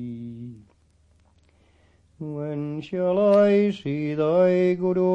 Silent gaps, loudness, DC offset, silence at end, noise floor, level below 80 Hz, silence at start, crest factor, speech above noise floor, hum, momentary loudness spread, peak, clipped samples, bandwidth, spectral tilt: none; -22 LUFS; under 0.1%; 0 s; -60 dBFS; -64 dBFS; 0 s; 14 dB; 40 dB; none; 20 LU; -8 dBFS; under 0.1%; 8 kHz; -9 dB/octave